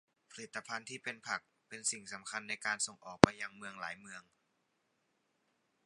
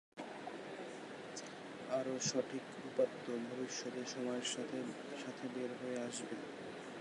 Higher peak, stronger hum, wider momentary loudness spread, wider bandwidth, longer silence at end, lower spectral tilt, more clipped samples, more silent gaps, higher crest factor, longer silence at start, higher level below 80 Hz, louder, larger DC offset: first, 0 dBFS vs -22 dBFS; neither; first, 23 LU vs 10 LU; about the same, 11.5 kHz vs 11.5 kHz; first, 1.65 s vs 0 s; about the same, -4 dB/octave vs -3.5 dB/octave; neither; neither; first, 38 dB vs 20 dB; first, 0.35 s vs 0.15 s; first, -64 dBFS vs -86 dBFS; first, -36 LUFS vs -43 LUFS; neither